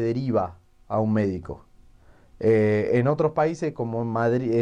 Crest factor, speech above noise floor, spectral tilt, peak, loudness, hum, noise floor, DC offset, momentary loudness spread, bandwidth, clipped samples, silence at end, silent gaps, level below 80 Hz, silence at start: 14 dB; 30 dB; -8.5 dB/octave; -10 dBFS; -24 LUFS; none; -52 dBFS; under 0.1%; 10 LU; 9.6 kHz; under 0.1%; 0 s; none; -52 dBFS; 0 s